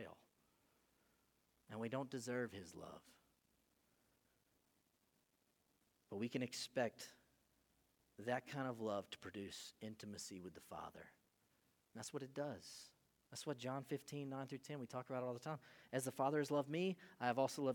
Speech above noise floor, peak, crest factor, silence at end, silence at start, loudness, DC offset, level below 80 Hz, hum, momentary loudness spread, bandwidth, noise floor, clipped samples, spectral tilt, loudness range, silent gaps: 36 dB; -24 dBFS; 24 dB; 0 s; 0 s; -47 LUFS; under 0.1%; -86 dBFS; none; 16 LU; 19 kHz; -82 dBFS; under 0.1%; -5 dB/octave; 9 LU; none